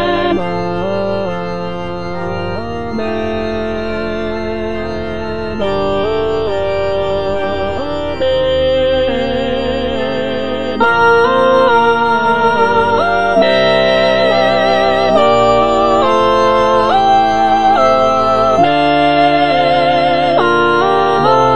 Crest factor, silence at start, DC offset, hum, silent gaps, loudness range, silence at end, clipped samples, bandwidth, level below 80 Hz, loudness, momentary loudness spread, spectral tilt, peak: 12 dB; 0 s; 4%; none; none; 8 LU; 0 s; under 0.1%; 10 kHz; -36 dBFS; -13 LUFS; 10 LU; -6 dB/octave; 0 dBFS